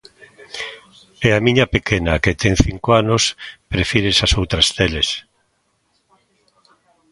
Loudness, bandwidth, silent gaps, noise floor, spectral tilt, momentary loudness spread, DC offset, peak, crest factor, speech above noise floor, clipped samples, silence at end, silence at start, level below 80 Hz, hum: -16 LUFS; 11.5 kHz; none; -65 dBFS; -4 dB/octave; 14 LU; under 0.1%; 0 dBFS; 18 dB; 49 dB; under 0.1%; 1.9 s; 0.2 s; -32 dBFS; none